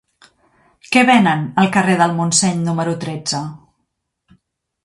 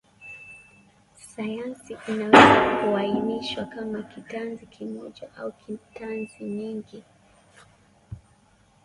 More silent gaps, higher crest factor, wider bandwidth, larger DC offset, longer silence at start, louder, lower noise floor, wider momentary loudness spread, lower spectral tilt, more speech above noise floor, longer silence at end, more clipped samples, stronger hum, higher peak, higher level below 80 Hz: neither; second, 18 dB vs 26 dB; about the same, 11.5 kHz vs 11.5 kHz; neither; first, 0.9 s vs 0.25 s; first, -15 LUFS vs -22 LUFS; first, -72 dBFS vs -60 dBFS; second, 11 LU vs 27 LU; about the same, -4 dB/octave vs -5 dB/octave; first, 57 dB vs 36 dB; first, 1.25 s vs 0.65 s; neither; neither; about the same, 0 dBFS vs 0 dBFS; about the same, -58 dBFS vs -56 dBFS